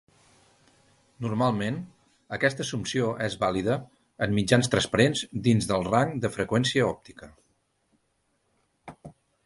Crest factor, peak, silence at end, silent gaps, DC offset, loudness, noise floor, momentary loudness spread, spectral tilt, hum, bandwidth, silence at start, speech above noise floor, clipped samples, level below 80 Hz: 22 dB; -6 dBFS; 0.35 s; none; under 0.1%; -26 LUFS; -73 dBFS; 13 LU; -5 dB/octave; none; 11.5 kHz; 1.2 s; 47 dB; under 0.1%; -54 dBFS